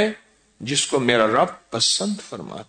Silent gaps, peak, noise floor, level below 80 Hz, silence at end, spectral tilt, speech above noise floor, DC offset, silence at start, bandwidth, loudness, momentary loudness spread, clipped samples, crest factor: none; -4 dBFS; -41 dBFS; -60 dBFS; 0.05 s; -2.5 dB/octave; 20 dB; under 0.1%; 0 s; 9.6 kHz; -20 LUFS; 16 LU; under 0.1%; 18 dB